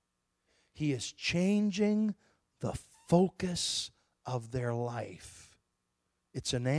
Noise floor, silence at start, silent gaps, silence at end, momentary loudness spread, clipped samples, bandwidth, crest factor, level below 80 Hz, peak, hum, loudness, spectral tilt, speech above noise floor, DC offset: -82 dBFS; 0.75 s; none; 0 s; 17 LU; under 0.1%; 11 kHz; 22 dB; -60 dBFS; -12 dBFS; none; -33 LUFS; -5 dB/octave; 50 dB; under 0.1%